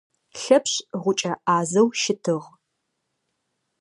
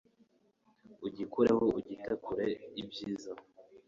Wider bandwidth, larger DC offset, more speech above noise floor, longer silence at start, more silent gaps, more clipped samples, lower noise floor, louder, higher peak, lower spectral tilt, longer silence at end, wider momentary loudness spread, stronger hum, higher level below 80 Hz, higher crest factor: first, 11.5 kHz vs 7.6 kHz; neither; first, 55 dB vs 37 dB; second, 0.35 s vs 0.9 s; neither; neither; first, -77 dBFS vs -71 dBFS; first, -22 LUFS vs -35 LUFS; first, -2 dBFS vs -16 dBFS; second, -4 dB/octave vs -6.5 dB/octave; first, 1.35 s vs 0.1 s; second, 9 LU vs 16 LU; neither; second, -74 dBFS vs -68 dBFS; about the same, 22 dB vs 20 dB